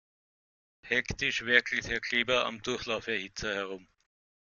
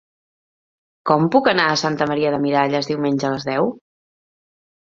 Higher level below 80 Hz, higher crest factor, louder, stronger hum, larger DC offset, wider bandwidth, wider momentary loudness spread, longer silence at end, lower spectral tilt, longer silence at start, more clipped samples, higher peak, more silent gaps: about the same, -56 dBFS vs -60 dBFS; first, 26 dB vs 20 dB; second, -30 LUFS vs -19 LUFS; neither; neither; about the same, 7.4 kHz vs 7.6 kHz; first, 10 LU vs 6 LU; second, 0.65 s vs 1.1 s; second, -3 dB/octave vs -5.5 dB/octave; second, 0.85 s vs 1.05 s; neither; second, -8 dBFS vs 0 dBFS; neither